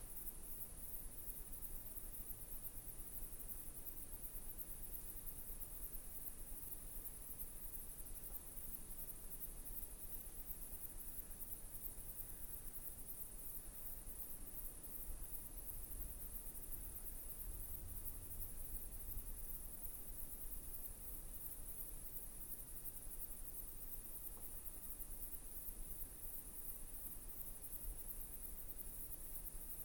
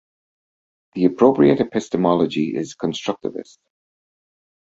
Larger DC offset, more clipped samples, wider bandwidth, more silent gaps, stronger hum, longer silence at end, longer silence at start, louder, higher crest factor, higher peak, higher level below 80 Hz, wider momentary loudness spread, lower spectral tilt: neither; neither; first, 18 kHz vs 8 kHz; neither; neither; second, 0 s vs 1.3 s; second, 0 s vs 0.95 s; second, -49 LUFS vs -19 LUFS; about the same, 18 dB vs 20 dB; second, -32 dBFS vs 0 dBFS; about the same, -54 dBFS vs -58 dBFS; second, 1 LU vs 14 LU; second, -3 dB/octave vs -6.5 dB/octave